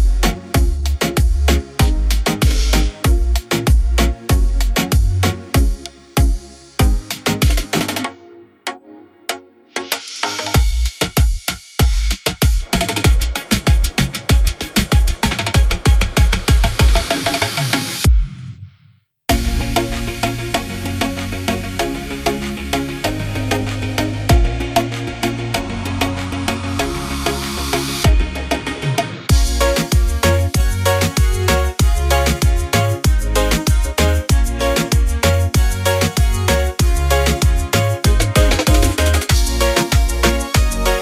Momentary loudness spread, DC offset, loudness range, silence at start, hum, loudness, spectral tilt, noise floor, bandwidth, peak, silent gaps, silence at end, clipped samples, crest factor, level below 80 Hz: 7 LU; under 0.1%; 6 LU; 0 s; none; -17 LUFS; -4.5 dB/octave; -52 dBFS; 16 kHz; -2 dBFS; none; 0 s; under 0.1%; 14 dB; -18 dBFS